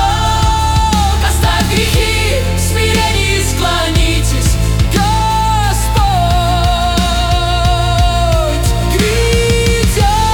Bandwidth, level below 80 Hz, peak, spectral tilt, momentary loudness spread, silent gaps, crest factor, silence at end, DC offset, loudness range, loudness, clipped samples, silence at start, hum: 19 kHz; -16 dBFS; 0 dBFS; -4.5 dB/octave; 2 LU; none; 10 dB; 0 s; under 0.1%; 0 LU; -12 LUFS; under 0.1%; 0 s; none